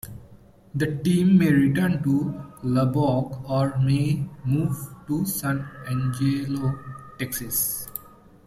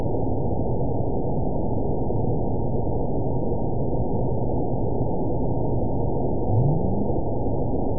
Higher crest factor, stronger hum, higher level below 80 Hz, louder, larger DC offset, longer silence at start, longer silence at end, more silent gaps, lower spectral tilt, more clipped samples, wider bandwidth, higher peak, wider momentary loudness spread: about the same, 16 dB vs 14 dB; neither; second, -52 dBFS vs -32 dBFS; about the same, -24 LUFS vs -26 LUFS; second, under 0.1% vs 6%; about the same, 0.05 s vs 0 s; first, 0.4 s vs 0 s; neither; second, -6.5 dB/octave vs -19 dB/octave; neither; first, 15.5 kHz vs 1 kHz; about the same, -8 dBFS vs -10 dBFS; first, 13 LU vs 3 LU